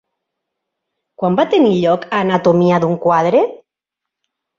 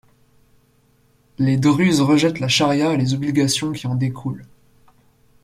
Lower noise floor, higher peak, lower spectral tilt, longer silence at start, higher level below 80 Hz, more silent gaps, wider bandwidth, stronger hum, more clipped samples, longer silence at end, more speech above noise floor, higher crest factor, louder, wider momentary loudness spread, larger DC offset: first, -82 dBFS vs -58 dBFS; about the same, -2 dBFS vs -4 dBFS; first, -7.5 dB/octave vs -5 dB/octave; second, 1.2 s vs 1.4 s; about the same, -58 dBFS vs -56 dBFS; neither; second, 7.4 kHz vs 15 kHz; neither; neither; about the same, 1 s vs 1 s; first, 69 dB vs 40 dB; about the same, 14 dB vs 16 dB; first, -14 LUFS vs -18 LUFS; second, 5 LU vs 9 LU; neither